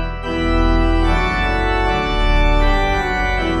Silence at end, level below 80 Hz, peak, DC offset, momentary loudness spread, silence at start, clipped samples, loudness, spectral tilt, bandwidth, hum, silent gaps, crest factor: 0 s; -18 dBFS; -4 dBFS; under 0.1%; 2 LU; 0 s; under 0.1%; -17 LUFS; -6 dB/octave; 8.4 kHz; none; none; 12 dB